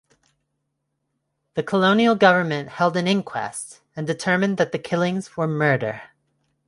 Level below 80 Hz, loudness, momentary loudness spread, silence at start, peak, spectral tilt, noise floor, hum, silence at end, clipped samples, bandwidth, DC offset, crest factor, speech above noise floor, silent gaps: -66 dBFS; -21 LUFS; 14 LU; 1.55 s; -2 dBFS; -5.5 dB/octave; -76 dBFS; none; 0.65 s; under 0.1%; 11.5 kHz; under 0.1%; 20 dB; 55 dB; none